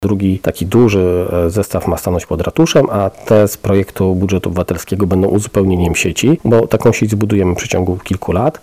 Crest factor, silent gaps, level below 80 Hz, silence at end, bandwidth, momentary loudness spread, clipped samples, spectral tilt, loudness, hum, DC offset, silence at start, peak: 12 dB; none; -34 dBFS; 0.05 s; 16 kHz; 6 LU; under 0.1%; -6 dB/octave; -14 LUFS; none; under 0.1%; 0 s; -2 dBFS